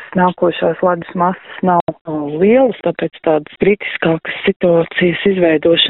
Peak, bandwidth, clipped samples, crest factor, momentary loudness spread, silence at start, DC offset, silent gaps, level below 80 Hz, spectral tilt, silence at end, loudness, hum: 0 dBFS; 4.1 kHz; under 0.1%; 14 dB; 7 LU; 0 s; under 0.1%; 1.81-1.87 s, 2.01-2.05 s, 4.56-4.60 s; -50 dBFS; -4 dB/octave; 0 s; -15 LUFS; none